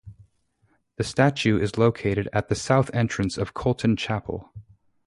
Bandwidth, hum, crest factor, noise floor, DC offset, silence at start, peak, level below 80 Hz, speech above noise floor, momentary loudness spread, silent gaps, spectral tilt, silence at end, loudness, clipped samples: 11.5 kHz; none; 20 dB; -67 dBFS; under 0.1%; 0.05 s; -6 dBFS; -48 dBFS; 44 dB; 8 LU; none; -6 dB/octave; 0.45 s; -24 LUFS; under 0.1%